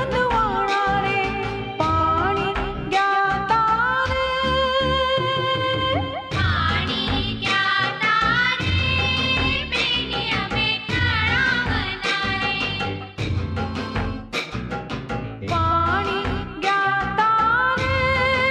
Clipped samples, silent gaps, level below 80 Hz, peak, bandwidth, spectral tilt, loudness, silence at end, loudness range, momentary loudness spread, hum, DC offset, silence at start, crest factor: under 0.1%; none; -36 dBFS; -8 dBFS; 10.5 kHz; -5 dB/octave; -21 LUFS; 0 s; 5 LU; 8 LU; none; under 0.1%; 0 s; 14 dB